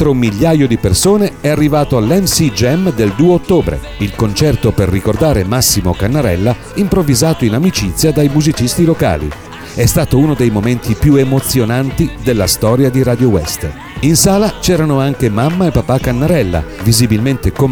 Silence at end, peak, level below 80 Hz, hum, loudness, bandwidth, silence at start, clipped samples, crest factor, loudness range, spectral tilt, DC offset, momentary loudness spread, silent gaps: 0 s; 0 dBFS; -28 dBFS; none; -12 LUFS; over 20 kHz; 0 s; under 0.1%; 12 dB; 1 LU; -5.5 dB/octave; 0.4%; 5 LU; none